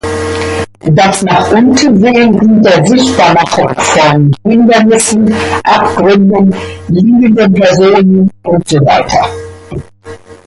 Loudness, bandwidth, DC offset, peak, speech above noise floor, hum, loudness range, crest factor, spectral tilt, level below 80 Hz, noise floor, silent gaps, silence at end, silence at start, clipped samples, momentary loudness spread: -7 LUFS; 11.5 kHz; under 0.1%; 0 dBFS; 23 dB; none; 1 LU; 8 dB; -5.5 dB/octave; -34 dBFS; -30 dBFS; none; 0.1 s; 0.05 s; under 0.1%; 9 LU